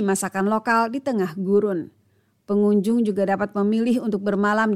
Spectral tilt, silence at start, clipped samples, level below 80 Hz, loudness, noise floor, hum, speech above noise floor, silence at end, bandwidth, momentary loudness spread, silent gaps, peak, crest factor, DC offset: -6 dB/octave; 0 s; under 0.1%; -66 dBFS; -22 LUFS; -63 dBFS; none; 42 dB; 0 s; 15 kHz; 5 LU; none; -8 dBFS; 14 dB; under 0.1%